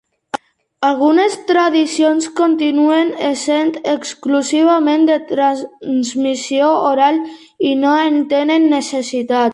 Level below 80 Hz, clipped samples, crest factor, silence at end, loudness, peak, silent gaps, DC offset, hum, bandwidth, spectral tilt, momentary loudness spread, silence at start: -66 dBFS; under 0.1%; 12 dB; 0 s; -15 LUFS; -2 dBFS; none; under 0.1%; none; 11.5 kHz; -3 dB/octave; 8 LU; 0.35 s